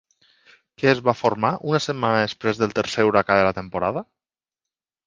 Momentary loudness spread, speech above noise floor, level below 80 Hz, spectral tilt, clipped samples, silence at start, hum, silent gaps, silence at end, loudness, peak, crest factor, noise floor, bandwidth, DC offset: 7 LU; 68 dB; -54 dBFS; -5.5 dB/octave; under 0.1%; 0.8 s; none; none; 1.05 s; -21 LUFS; 0 dBFS; 22 dB; -89 dBFS; 9.6 kHz; under 0.1%